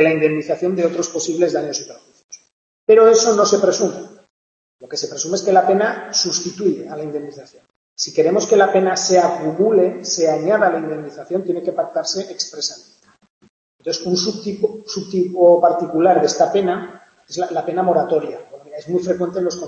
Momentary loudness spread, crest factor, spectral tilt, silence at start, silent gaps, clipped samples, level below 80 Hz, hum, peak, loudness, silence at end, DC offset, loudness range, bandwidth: 14 LU; 16 dB; -3.5 dB/octave; 0 s; 2.24-2.29 s, 2.52-2.87 s, 4.30-4.79 s, 7.76-7.96 s, 13.30-13.41 s, 13.49-13.79 s; under 0.1%; -68 dBFS; none; -2 dBFS; -17 LUFS; 0 s; under 0.1%; 7 LU; 8.2 kHz